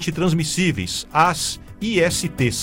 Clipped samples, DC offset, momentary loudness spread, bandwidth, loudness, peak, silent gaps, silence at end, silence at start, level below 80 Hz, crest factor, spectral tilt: under 0.1%; under 0.1%; 7 LU; 17 kHz; -20 LUFS; -2 dBFS; none; 0 s; 0 s; -42 dBFS; 18 dB; -4 dB/octave